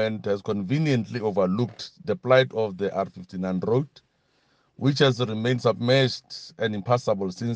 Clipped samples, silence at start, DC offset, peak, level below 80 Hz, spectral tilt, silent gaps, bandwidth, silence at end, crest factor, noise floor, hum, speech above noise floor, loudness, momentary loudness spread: under 0.1%; 0 s; under 0.1%; -4 dBFS; -66 dBFS; -6.5 dB/octave; none; 8.8 kHz; 0 s; 20 dB; -67 dBFS; none; 42 dB; -25 LUFS; 10 LU